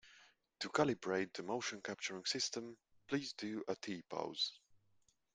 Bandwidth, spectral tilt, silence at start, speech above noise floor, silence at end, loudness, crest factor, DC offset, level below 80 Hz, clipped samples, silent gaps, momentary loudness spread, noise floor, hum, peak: 10.5 kHz; -3 dB/octave; 0.05 s; 35 dB; 0.6 s; -41 LUFS; 24 dB; under 0.1%; -80 dBFS; under 0.1%; none; 8 LU; -76 dBFS; none; -18 dBFS